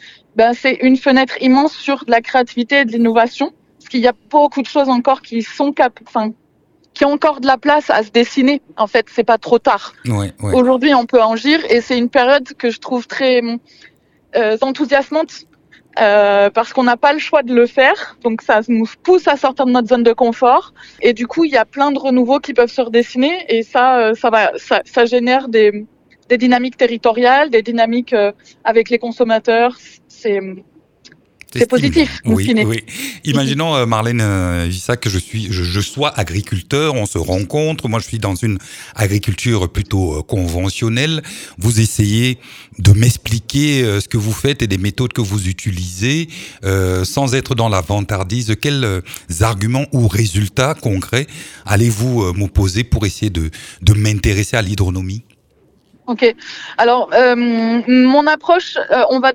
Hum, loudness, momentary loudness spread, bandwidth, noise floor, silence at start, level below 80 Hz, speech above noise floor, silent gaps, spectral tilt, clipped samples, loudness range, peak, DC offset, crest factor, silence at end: none; -15 LUFS; 8 LU; 17.5 kHz; -55 dBFS; 0.05 s; -36 dBFS; 41 dB; none; -5.5 dB/octave; under 0.1%; 4 LU; 0 dBFS; under 0.1%; 14 dB; 0 s